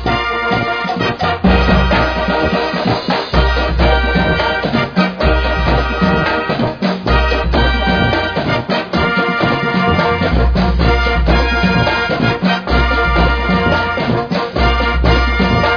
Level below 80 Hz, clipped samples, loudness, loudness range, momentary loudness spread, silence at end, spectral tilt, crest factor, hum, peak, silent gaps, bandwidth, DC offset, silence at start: -20 dBFS; under 0.1%; -14 LUFS; 1 LU; 3 LU; 0 s; -7 dB/octave; 14 dB; none; 0 dBFS; none; 5.4 kHz; under 0.1%; 0 s